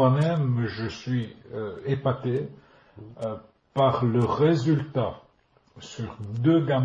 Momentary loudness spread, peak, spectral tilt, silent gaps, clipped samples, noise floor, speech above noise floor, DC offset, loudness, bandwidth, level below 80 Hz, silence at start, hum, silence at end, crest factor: 15 LU; -8 dBFS; -8 dB/octave; none; under 0.1%; -63 dBFS; 38 dB; under 0.1%; -26 LUFS; 7.6 kHz; -58 dBFS; 0 s; none; 0 s; 16 dB